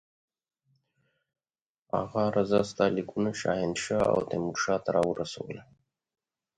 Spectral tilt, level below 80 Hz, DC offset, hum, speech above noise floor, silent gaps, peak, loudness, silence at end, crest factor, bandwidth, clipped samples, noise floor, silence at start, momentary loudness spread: -5.5 dB/octave; -60 dBFS; under 0.1%; none; over 62 dB; none; -10 dBFS; -29 LUFS; 0.95 s; 22 dB; 11 kHz; under 0.1%; under -90 dBFS; 1.95 s; 9 LU